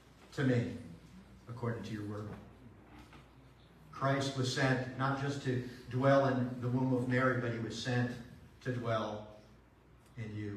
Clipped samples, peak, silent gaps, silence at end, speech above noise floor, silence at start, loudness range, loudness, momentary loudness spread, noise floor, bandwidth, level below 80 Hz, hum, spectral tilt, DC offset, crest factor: under 0.1%; -16 dBFS; none; 0 s; 28 dB; 0.2 s; 8 LU; -35 LUFS; 21 LU; -62 dBFS; 11.5 kHz; -64 dBFS; none; -6.5 dB/octave; under 0.1%; 20 dB